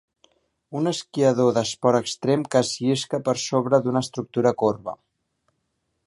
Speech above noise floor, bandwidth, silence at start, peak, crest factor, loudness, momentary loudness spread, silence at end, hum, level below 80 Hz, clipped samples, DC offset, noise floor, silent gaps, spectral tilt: 53 dB; 11.5 kHz; 0.7 s; -4 dBFS; 20 dB; -22 LUFS; 7 LU; 1.1 s; none; -64 dBFS; under 0.1%; under 0.1%; -75 dBFS; none; -5 dB/octave